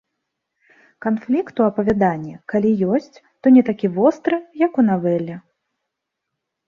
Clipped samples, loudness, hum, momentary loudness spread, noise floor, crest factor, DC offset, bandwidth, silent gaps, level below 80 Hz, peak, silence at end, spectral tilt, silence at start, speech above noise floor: under 0.1%; -19 LUFS; none; 10 LU; -80 dBFS; 16 dB; under 0.1%; 6.8 kHz; none; -56 dBFS; -4 dBFS; 1.3 s; -9 dB/octave; 1 s; 62 dB